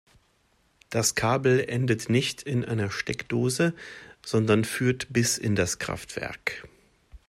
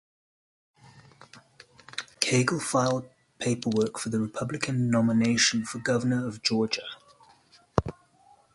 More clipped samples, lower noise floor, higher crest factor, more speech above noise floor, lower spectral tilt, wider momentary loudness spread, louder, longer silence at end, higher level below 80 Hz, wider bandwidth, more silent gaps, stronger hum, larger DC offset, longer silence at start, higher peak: neither; first, -67 dBFS vs -60 dBFS; second, 18 dB vs 26 dB; first, 41 dB vs 34 dB; about the same, -4.5 dB/octave vs -4.5 dB/octave; second, 9 LU vs 12 LU; about the same, -26 LUFS vs -27 LUFS; second, 0.1 s vs 0.65 s; about the same, -56 dBFS vs -54 dBFS; first, 16 kHz vs 11.5 kHz; neither; neither; neither; about the same, 0.9 s vs 0.95 s; second, -8 dBFS vs -2 dBFS